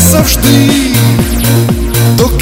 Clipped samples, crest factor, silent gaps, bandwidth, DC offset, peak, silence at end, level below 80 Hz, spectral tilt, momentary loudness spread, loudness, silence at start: 2%; 8 dB; none; over 20 kHz; under 0.1%; 0 dBFS; 0 s; -18 dBFS; -5 dB/octave; 4 LU; -8 LUFS; 0 s